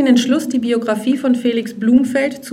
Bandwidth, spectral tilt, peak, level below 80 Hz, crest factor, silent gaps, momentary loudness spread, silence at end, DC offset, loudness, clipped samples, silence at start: 14.5 kHz; -5 dB/octave; -2 dBFS; -56 dBFS; 14 dB; none; 5 LU; 0 s; under 0.1%; -16 LUFS; under 0.1%; 0 s